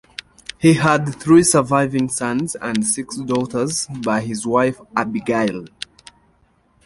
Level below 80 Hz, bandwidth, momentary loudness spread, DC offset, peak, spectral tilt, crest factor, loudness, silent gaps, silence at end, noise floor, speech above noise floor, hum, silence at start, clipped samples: -52 dBFS; 11.5 kHz; 17 LU; under 0.1%; -2 dBFS; -5 dB/octave; 18 dB; -18 LUFS; none; 1.2 s; -58 dBFS; 41 dB; none; 0.6 s; under 0.1%